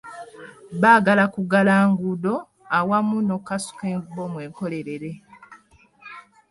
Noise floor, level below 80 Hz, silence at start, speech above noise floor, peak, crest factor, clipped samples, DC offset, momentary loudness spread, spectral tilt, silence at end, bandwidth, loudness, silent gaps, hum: -54 dBFS; -64 dBFS; 0.05 s; 33 dB; -2 dBFS; 20 dB; under 0.1%; under 0.1%; 24 LU; -6.5 dB/octave; 0.3 s; 11.5 kHz; -21 LUFS; none; none